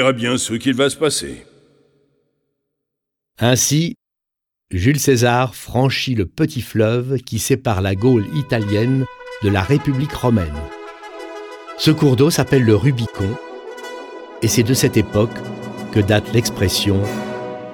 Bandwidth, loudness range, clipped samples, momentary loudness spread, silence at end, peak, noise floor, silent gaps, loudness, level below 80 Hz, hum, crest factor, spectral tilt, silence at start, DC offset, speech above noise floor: 18.5 kHz; 4 LU; under 0.1%; 17 LU; 0 s; 0 dBFS; -83 dBFS; none; -17 LUFS; -42 dBFS; none; 18 dB; -5 dB/octave; 0 s; under 0.1%; 67 dB